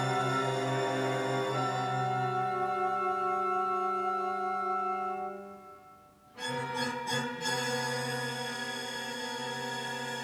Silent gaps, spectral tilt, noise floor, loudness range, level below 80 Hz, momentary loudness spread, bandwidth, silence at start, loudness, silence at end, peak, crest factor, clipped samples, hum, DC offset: none; -4 dB/octave; -57 dBFS; 4 LU; -74 dBFS; 6 LU; 19.5 kHz; 0 s; -32 LUFS; 0 s; -18 dBFS; 14 dB; under 0.1%; none; under 0.1%